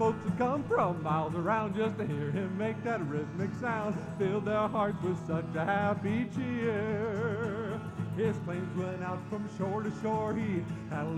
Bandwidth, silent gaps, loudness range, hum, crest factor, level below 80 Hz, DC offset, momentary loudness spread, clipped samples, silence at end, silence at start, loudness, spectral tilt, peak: 10.5 kHz; none; 3 LU; none; 14 dB; -60 dBFS; under 0.1%; 6 LU; under 0.1%; 0 s; 0 s; -33 LUFS; -8 dB/octave; -18 dBFS